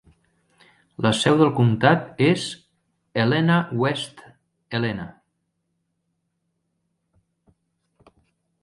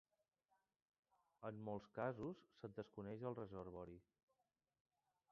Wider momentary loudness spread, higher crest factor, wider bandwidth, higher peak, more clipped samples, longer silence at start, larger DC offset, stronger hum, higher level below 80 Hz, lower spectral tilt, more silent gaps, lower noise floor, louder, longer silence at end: first, 15 LU vs 10 LU; about the same, 20 dB vs 24 dB; first, 11.5 kHz vs 6.8 kHz; first, -4 dBFS vs -30 dBFS; neither; second, 1 s vs 1.4 s; neither; neither; first, -60 dBFS vs -78 dBFS; about the same, -6 dB/octave vs -7 dB/octave; neither; second, -75 dBFS vs under -90 dBFS; first, -21 LUFS vs -52 LUFS; first, 3.55 s vs 1.3 s